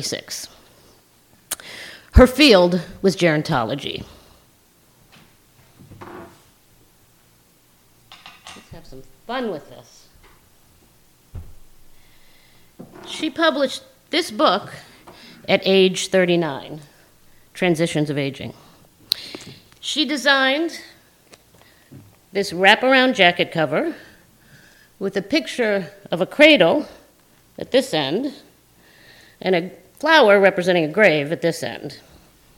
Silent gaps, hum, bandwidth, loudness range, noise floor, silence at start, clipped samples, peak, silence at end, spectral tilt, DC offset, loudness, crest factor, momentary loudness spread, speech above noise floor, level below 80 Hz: none; none; 18 kHz; 17 LU; -56 dBFS; 0 s; under 0.1%; 0 dBFS; 0.6 s; -4.5 dB/octave; under 0.1%; -18 LUFS; 22 dB; 24 LU; 38 dB; -36 dBFS